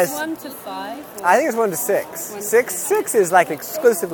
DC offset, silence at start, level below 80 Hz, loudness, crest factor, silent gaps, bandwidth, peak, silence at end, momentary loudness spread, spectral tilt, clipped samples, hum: under 0.1%; 0 s; -66 dBFS; -19 LUFS; 18 dB; none; 19.5 kHz; 0 dBFS; 0 s; 14 LU; -3 dB/octave; under 0.1%; none